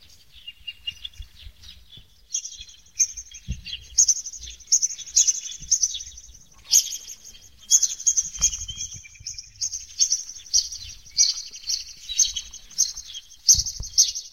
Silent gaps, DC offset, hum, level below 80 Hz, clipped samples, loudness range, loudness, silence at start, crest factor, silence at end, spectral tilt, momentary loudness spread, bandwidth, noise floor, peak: none; 0.2%; none; -48 dBFS; under 0.1%; 4 LU; -21 LUFS; 0.35 s; 24 dB; 0.05 s; 2.5 dB/octave; 19 LU; 16 kHz; -50 dBFS; -2 dBFS